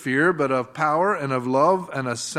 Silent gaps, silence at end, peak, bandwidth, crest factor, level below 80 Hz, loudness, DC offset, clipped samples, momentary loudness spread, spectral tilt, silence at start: none; 0 s; -6 dBFS; 14 kHz; 16 dB; -68 dBFS; -22 LUFS; under 0.1%; under 0.1%; 5 LU; -5 dB/octave; 0 s